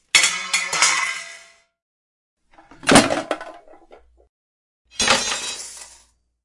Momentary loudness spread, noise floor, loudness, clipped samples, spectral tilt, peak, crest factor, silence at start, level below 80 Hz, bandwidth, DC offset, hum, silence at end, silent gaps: 20 LU; -56 dBFS; -18 LUFS; under 0.1%; -1.5 dB/octave; 0 dBFS; 22 dB; 0.15 s; -50 dBFS; 11.5 kHz; under 0.1%; none; 0.6 s; 1.82-2.37 s, 4.29-4.85 s